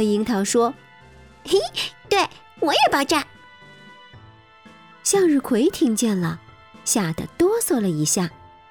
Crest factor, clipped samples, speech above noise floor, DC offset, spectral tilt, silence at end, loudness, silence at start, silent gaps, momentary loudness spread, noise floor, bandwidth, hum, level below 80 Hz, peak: 16 dB; under 0.1%; 28 dB; under 0.1%; -3.5 dB/octave; 0.4 s; -21 LUFS; 0 s; none; 10 LU; -48 dBFS; 19.5 kHz; none; -54 dBFS; -6 dBFS